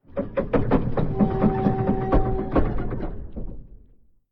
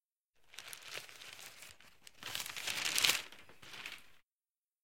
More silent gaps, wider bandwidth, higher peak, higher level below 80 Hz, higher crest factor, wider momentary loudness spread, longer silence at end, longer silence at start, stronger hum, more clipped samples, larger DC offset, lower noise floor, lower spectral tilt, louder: second, none vs 0.05-0.10 s, 0.23-0.29 s, 4.32-4.40 s, 4.51-4.55 s; second, 4.9 kHz vs 17 kHz; about the same, -6 dBFS vs -8 dBFS; first, -30 dBFS vs -80 dBFS; second, 16 dB vs 34 dB; second, 15 LU vs 25 LU; first, 0.55 s vs 0 s; about the same, 0.1 s vs 0 s; neither; neither; neither; second, -53 dBFS vs under -90 dBFS; first, -11 dB/octave vs 1 dB/octave; first, -24 LUFS vs -36 LUFS